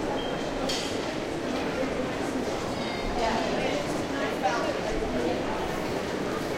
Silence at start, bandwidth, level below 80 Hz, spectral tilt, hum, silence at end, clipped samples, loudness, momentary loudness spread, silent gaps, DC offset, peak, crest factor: 0 s; 16 kHz; -44 dBFS; -4.5 dB/octave; none; 0 s; under 0.1%; -29 LUFS; 3 LU; none; under 0.1%; -12 dBFS; 16 dB